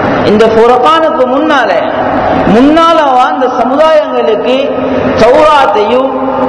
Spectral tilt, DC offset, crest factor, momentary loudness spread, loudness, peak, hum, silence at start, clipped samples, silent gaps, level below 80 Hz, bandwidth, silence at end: -6 dB/octave; under 0.1%; 6 dB; 6 LU; -7 LUFS; 0 dBFS; none; 0 s; 6%; none; -36 dBFS; 11 kHz; 0 s